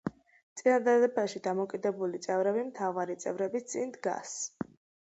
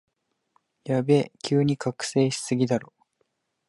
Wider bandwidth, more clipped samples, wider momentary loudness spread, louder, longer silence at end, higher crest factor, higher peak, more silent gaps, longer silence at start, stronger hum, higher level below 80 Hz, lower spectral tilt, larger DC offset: second, 8.2 kHz vs 11.5 kHz; neither; first, 12 LU vs 6 LU; second, -31 LUFS vs -25 LUFS; second, 0.45 s vs 0.85 s; about the same, 16 dB vs 18 dB; second, -14 dBFS vs -8 dBFS; first, 0.43-0.56 s vs none; second, 0.05 s vs 0.85 s; neither; second, -74 dBFS vs -66 dBFS; second, -4.5 dB/octave vs -6 dB/octave; neither